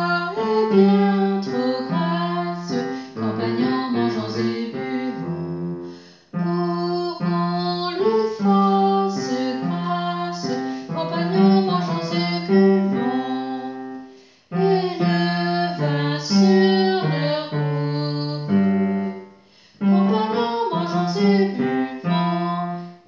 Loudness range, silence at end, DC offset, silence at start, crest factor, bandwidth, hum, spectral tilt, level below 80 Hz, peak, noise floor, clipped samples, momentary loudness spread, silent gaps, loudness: 5 LU; 0.15 s; under 0.1%; 0 s; 16 dB; 7.4 kHz; none; -7 dB/octave; -66 dBFS; -4 dBFS; -51 dBFS; under 0.1%; 11 LU; none; -21 LUFS